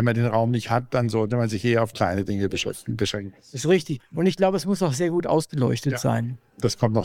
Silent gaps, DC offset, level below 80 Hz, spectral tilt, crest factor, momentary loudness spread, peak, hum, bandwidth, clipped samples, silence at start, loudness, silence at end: none; under 0.1%; -54 dBFS; -6 dB/octave; 16 dB; 6 LU; -6 dBFS; none; 16 kHz; under 0.1%; 0 s; -24 LUFS; 0 s